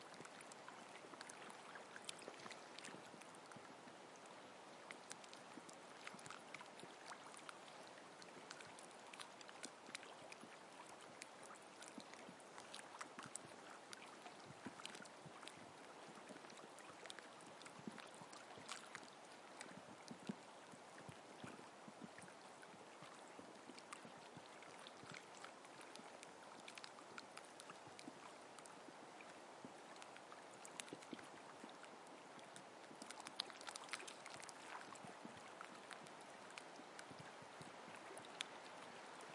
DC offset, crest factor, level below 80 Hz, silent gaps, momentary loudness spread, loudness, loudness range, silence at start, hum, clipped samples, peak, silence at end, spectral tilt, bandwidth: under 0.1%; 36 dB; under -90 dBFS; none; 5 LU; -57 LUFS; 4 LU; 0 s; none; under 0.1%; -22 dBFS; 0 s; -2.5 dB/octave; 12 kHz